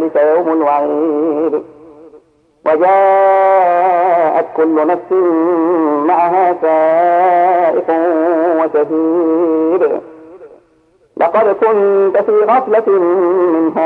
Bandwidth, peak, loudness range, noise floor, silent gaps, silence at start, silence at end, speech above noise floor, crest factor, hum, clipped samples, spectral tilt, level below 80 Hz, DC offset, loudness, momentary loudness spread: 4.3 kHz; 0 dBFS; 3 LU; -52 dBFS; none; 0 s; 0 s; 41 dB; 12 dB; none; under 0.1%; -8.5 dB/octave; -64 dBFS; under 0.1%; -12 LUFS; 5 LU